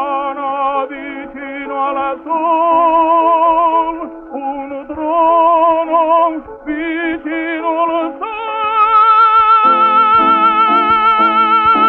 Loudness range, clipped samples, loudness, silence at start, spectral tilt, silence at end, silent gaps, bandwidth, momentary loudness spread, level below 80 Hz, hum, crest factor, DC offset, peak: 6 LU; under 0.1%; -12 LUFS; 0 s; -6.5 dB/octave; 0 s; none; 5.2 kHz; 15 LU; -48 dBFS; none; 10 dB; under 0.1%; -2 dBFS